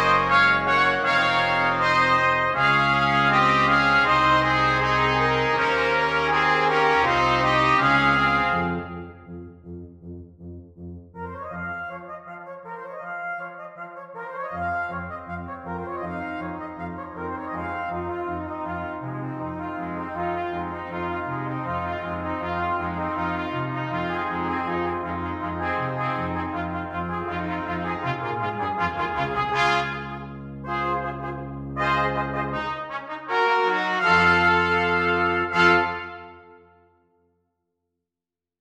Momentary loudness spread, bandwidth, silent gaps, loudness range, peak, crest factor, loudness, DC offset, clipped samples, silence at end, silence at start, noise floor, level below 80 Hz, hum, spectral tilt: 19 LU; 15 kHz; none; 13 LU; -4 dBFS; 20 dB; -23 LUFS; under 0.1%; under 0.1%; 2.05 s; 0 s; -89 dBFS; -48 dBFS; none; -5.5 dB/octave